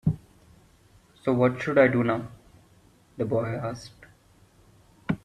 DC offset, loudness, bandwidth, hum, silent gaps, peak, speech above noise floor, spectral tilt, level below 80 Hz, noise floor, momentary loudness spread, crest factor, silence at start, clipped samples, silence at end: under 0.1%; -26 LUFS; 12.5 kHz; none; none; -8 dBFS; 34 dB; -8 dB/octave; -54 dBFS; -58 dBFS; 21 LU; 22 dB; 0.05 s; under 0.1%; 0.05 s